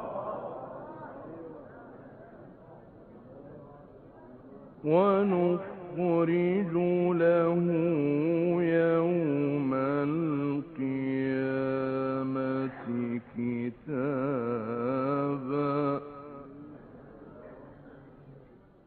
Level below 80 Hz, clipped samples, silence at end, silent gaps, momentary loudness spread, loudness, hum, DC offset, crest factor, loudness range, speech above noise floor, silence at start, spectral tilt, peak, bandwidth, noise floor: -66 dBFS; under 0.1%; 0.5 s; none; 24 LU; -29 LUFS; none; under 0.1%; 18 dB; 16 LU; 28 dB; 0 s; -8 dB/octave; -12 dBFS; 4.4 kHz; -55 dBFS